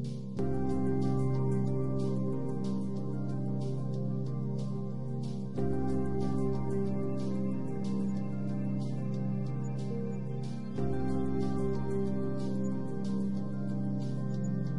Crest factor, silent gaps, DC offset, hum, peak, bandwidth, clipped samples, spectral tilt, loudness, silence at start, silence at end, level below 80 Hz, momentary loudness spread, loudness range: 14 dB; none; 1%; none; -18 dBFS; 10.5 kHz; under 0.1%; -9 dB/octave; -34 LUFS; 0 s; 0 s; -52 dBFS; 5 LU; 2 LU